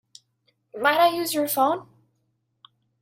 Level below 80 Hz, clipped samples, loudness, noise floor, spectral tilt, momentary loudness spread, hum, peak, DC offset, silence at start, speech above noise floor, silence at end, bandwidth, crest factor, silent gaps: -74 dBFS; under 0.1%; -22 LUFS; -73 dBFS; -2.5 dB/octave; 10 LU; none; -6 dBFS; under 0.1%; 0.75 s; 51 dB; 1.2 s; 16.5 kHz; 20 dB; none